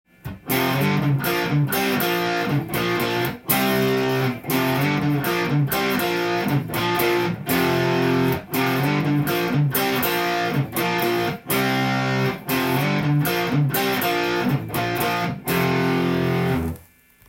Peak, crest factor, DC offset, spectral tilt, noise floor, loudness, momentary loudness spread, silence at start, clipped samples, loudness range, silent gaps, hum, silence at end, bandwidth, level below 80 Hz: -2 dBFS; 18 dB; under 0.1%; -5.5 dB/octave; -51 dBFS; -21 LUFS; 3 LU; 0.25 s; under 0.1%; 1 LU; none; none; 0.5 s; 17 kHz; -52 dBFS